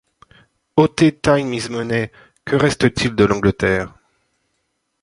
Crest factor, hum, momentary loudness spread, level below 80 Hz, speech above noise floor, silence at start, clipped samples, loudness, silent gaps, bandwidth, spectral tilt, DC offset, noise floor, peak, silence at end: 18 dB; none; 8 LU; -42 dBFS; 54 dB; 0.75 s; under 0.1%; -17 LUFS; none; 11.5 kHz; -6 dB/octave; under 0.1%; -71 dBFS; -2 dBFS; 1.15 s